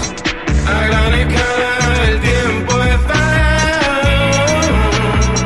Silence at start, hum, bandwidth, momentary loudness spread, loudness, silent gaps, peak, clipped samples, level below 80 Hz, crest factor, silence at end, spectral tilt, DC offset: 0 s; none; 12 kHz; 3 LU; -13 LUFS; none; 0 dBFS; under 0.1%; -18 dBFS; 12 dB; 0 s; -4.5 dB/octave; 1%